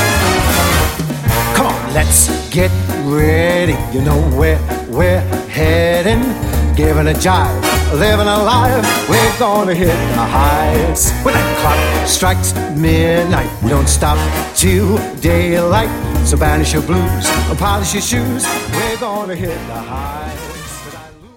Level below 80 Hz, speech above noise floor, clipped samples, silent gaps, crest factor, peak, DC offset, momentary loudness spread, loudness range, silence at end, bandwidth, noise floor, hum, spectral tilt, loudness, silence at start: -20 dBFS; 21 dB; under 0.1%; none; 14 dB; 0 dBFS; under 0.1%; 7 LU; 3 LU; 0.1 s; 17 kHz; -34 dBFS; none; -4.5 dB/octave; -13 LUFS; 0 s